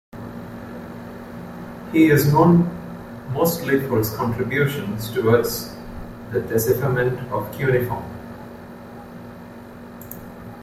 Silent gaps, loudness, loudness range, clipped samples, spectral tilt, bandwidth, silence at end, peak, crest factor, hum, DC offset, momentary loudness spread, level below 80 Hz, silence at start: none; -20 LUFS; 7 LU; under 0.1%; -6.5 dB/octave; 16 kHz; 0 s; -2 dBFS; 20 dB; none; under 0.1%; 23 LU; -48 dBFS; 0.15 s